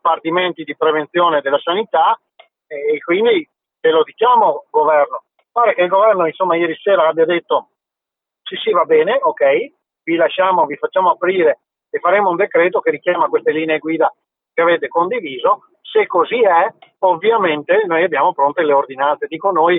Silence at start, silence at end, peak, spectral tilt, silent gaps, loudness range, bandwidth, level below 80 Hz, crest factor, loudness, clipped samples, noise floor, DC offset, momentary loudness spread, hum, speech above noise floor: 0.05 s; 0 s; -2 dBFS; -9.5 dB/octave; none; 2 LU; 3.9 kHz; -76 dBFS; 14 dB; -15 LUFS; under 0.1%; -84 dBFS; under 0.1%; 7 LU; none; 70 dB